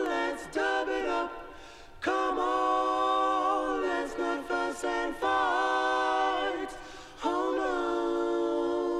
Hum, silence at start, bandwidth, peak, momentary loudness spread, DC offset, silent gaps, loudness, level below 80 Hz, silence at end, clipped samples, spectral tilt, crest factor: none; 0 s; 13 kHz; -16 dBFS; 9 LU; under 0.1%; none; -29 LUFS; -56 dBFS; 0 s; under 0.1%; -3 dB/octave; 14 dB